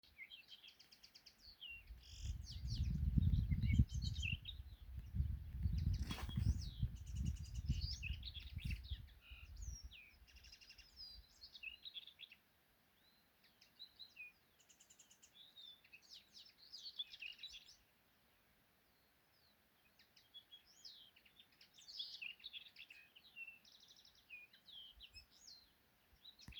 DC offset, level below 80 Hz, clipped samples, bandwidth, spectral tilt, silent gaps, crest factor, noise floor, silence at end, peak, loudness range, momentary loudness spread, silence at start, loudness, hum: under 0.1%; -52 dBFS; under 0.1%; over 20 kHz; -5 dB/octave; none; 28 dB; -76 dBFS; 0 s; -20 dBFS; 19 LU; 21 LU; 0.05 s; -47 LUFS; none